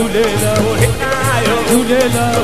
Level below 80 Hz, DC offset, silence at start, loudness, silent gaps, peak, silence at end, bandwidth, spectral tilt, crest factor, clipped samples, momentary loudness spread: -30 dBFS; 4%; 0 s; -13 LUFS; none; 0 dBFS; 0 s; 14.5 kHz; -4.5 dB/octave; 14 dB; under 0.1%; 2 LU